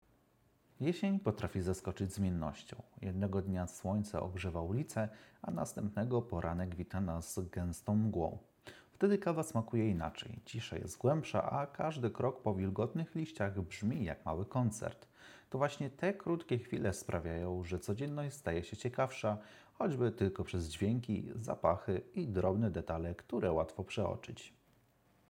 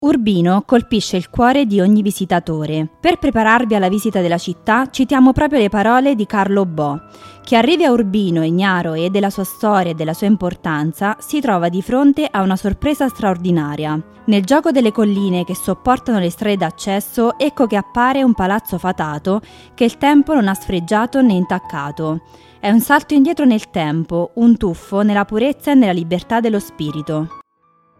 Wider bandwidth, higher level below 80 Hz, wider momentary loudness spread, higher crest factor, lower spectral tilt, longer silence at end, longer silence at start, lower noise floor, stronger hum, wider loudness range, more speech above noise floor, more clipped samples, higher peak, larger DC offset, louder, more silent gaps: about the same, 17 kHz vs 15.5 kHz; second, -62 dBFS vs -42 dBFS; about the same, 9 LU vs 8 LU; first, 22 dB vs 14 dB; about the same, -7 dB/octave vs -6 dB/octave; first, 0.8 s vs 0.6 s; first, 0.8 s vs 0 s; first, -72 dBFS vs -57 dBFS; neither; about the same, 3 LU vs 2 LU; second, 35 dB vs 42 dB; neither; second, -16 dBFS vs 0 dBFS; neither; second, -38 LUFS vs -16 LUFS; neither